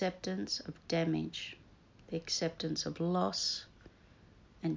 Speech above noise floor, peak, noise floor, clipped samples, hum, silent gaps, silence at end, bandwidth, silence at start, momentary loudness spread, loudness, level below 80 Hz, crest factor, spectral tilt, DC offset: 25 dB; -20 dBFS; -61 dBFS; under 0.1%; none; none; 0 s; 7.6 kHz; 0 s; 10 LU; -36 LUFS; -64 dBFS; 18 dB; -4.5 dB/octave; under 0.1%